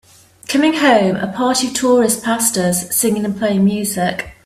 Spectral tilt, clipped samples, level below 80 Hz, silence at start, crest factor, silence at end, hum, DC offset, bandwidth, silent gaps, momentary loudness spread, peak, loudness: -4 dB/octave; under 0.1%; -52 dBFS; 0.5 s; 14 dB; 0.15 s; none; under 0.1%; 16 kHz; none; 6 LU; 0 dBFS; -15 LUFS